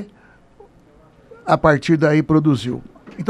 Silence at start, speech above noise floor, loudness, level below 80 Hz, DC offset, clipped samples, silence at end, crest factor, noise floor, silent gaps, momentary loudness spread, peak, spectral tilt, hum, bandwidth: 0 s; 34 dB; -17 LUFS; -46 dBFS; under 0.1%; under 0.1%; 0 s; 18 dB; -50 dBFS; none; 18 LU; 0 dBFS; -7.5 dB/octave; none; 10.5 kHz